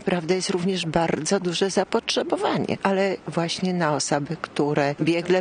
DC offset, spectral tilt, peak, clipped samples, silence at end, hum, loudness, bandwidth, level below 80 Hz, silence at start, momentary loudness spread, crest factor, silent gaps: under 0.1%; -4.5 dB/octave; -6 dBFS; under 0.1%; 0 s; none; -23 LUFS; 10 kHz; -58 dBFS; 0 s; 3 LU; 18 dB; none